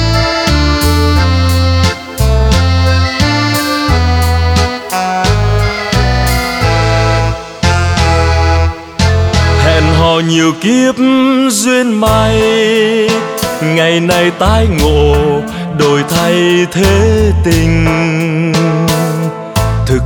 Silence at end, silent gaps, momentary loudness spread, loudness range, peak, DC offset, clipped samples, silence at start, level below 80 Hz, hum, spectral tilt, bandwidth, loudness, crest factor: 0 s; none; 5 LU; 2 LU; 0 dBFS; under 0.1%; under 0.1%; 0 s; -18 dBFS; none; -5.5 dB/octave; 19.5 kHz; -10 LUFS; 10 dB